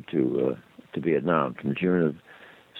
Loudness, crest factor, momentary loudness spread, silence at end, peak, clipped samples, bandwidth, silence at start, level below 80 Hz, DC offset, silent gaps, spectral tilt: -26 LUFS; 18 dB; 13 LU; 0 s; -8 dBFS; under 0.1%; 4.2 kHz; 0.1 s; -64 dBFS; under 0.1%; none; -9.5 dB/octave